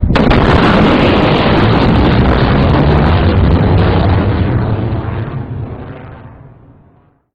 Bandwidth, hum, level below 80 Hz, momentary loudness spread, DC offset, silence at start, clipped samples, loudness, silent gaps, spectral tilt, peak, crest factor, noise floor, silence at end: 7.2 kHz; none; -18 dBFS; 13 LU; under 0.1%; 0 s; 0.1%; -10 LUFS; none; -8.5 dB/octave; 0 dBFS; 10 dB; -48 dBFS; 0.85 s